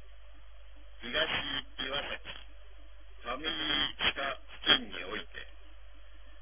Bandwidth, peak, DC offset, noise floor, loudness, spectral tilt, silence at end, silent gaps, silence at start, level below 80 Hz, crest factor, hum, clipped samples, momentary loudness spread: 3.7 kHz; -8 dBFS; 0.5%; -54 dBFS; -32 LUFS; 0.5 dB/octave; 0 s; none; 0 s; -54 dBFS; 28 dB; none; under 0.1%; 20 LU